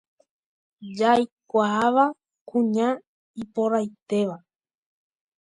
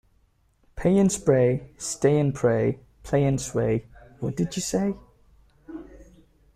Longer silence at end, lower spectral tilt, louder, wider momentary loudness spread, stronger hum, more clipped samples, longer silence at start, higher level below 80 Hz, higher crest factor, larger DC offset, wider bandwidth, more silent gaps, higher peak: first, 1.05 s vs 0.55 s; about the same, -6 dB/octave vs -6 dB/octave; about the same, -24 LUFS vs -24 LUFS; about the same, 19 LU vs 18 LU; neither; neither; about the same, 0.8 s vs 0.75 s; second, -70 dBFS vs -50 dBFS; about the same, 18 dB vs 18 dB; neither; second, 11 kHz vs 14.5 kHz; first, 1.32-1.37 s, 2.41-2.46 s, 3.07-3.34 s, 4.02-4.06 s vs none; about the same, -6 dBFS vs -6 dBFS